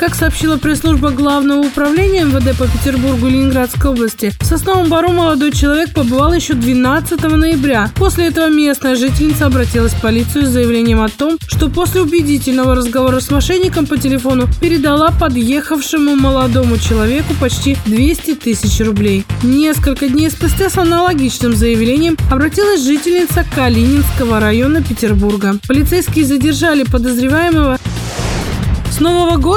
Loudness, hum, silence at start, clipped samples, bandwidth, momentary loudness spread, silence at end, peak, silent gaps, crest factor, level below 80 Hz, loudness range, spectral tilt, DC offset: -12 LUFS; none; 0 s; under 0.1%; 19.5 kHz; 3 LU; 0 s; 0 dBFS; none; 12 dB; -22 dBFS; 1 LU; -5.5 dB/octave; under 0.1%